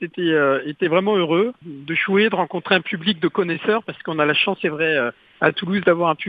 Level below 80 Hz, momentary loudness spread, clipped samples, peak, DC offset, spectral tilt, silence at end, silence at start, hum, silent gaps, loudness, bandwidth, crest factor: -64 dBFS; 6 LU; under 0.1%; 0 dBFS; under 0.1%; -8 dB/octave; 0 s; 0 s; none; none; -20 LUFS; 5 kHz; 20 dB